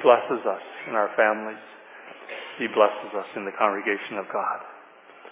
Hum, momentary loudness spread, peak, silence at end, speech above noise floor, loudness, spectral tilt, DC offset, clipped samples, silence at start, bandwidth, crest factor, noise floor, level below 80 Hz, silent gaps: none; 20 LU; -4 dBFS; 0 s; 25 dB; -25 LUFS; -7.5 dB/octave; under 0.1%; under 0.1%; 0 s; 3.9 kHz; 22 dB; -49 dBFS; under -90 dBFS; none